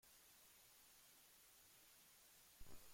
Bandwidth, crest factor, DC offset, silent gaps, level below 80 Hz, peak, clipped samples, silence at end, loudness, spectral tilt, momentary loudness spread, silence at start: 16.5 kHz; 18 dB; under 0.1%; none; -76 dBFS; -46 dBFS; under 0.1%; 0 s; -66 LUFS; -1.5 dB/octave; 1 LU; 0 s